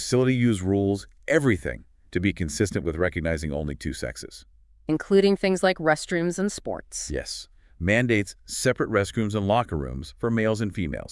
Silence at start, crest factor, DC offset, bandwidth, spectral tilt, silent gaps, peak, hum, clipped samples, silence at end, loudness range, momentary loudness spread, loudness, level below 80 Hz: 0 s; 18 dB; under 0.1%; 12 kHz; -5.5 dB/octave; none; -6 dBFS; none; under 0.1%; 0 s; 2 LU; 11 LU; -25 LUFS; -44 dBFS